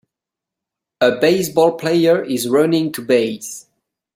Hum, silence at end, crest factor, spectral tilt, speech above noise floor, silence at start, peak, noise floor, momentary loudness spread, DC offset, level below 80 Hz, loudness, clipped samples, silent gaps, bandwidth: none; 0.55 s; 16 dB; -5 dB/octave; 69 dB; 1 s; -2 dBFS; -85 dBFS; 10 LU; under 0.1%; -60 dBFS; -16 LUFS; under 0.1%; none; 16.5 kHz